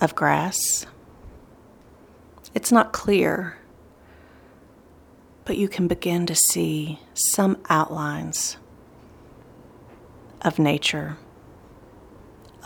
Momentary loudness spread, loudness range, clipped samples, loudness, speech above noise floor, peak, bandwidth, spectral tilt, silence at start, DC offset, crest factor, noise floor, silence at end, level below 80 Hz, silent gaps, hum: 12 LU; 6 LU; under 0.1%; -22 LUFS; 29 dB; -2 dBFS; over 20 kHz; -3.5 dB/octave; 0 s; under 0.1%; 22 dB; -51 dBFS; 0.2 s; -54 dBFS; none; none